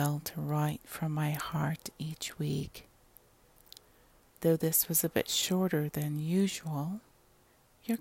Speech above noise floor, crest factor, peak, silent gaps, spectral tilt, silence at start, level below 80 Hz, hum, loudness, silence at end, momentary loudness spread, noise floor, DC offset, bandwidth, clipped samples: 33 dB; 20 dB; -14 dBFS; none; -4.5 dB/octave; 0 s; -62 dBFS; none; -32 LUFS; 0 s; 12 LU; -65 dBFS; under 0.1%; 16.5 kHz; under 0.1%